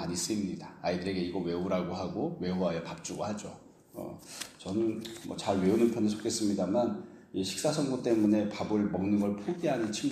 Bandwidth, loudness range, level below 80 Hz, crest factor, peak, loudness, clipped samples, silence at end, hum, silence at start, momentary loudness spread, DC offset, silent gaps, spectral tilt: 15 kHz; 6 LU; -66 dBFS; 18 dB; -14 dBFS; -32 LUFS; under 0.1%; 0 s; none; 0 s; 13 LU; under 0.1%; none; -5.5 dB/octave